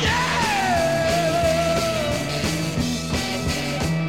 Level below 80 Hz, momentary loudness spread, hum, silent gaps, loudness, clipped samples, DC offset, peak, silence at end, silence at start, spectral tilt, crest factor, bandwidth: -38 dBFS; 4 LU; none; none; -21 LUFS; under 0.1%; 0.5%; -8 dBFS; 0 s; 0 s; -4.5 dB/octave; 14 dB; 16.5 kHz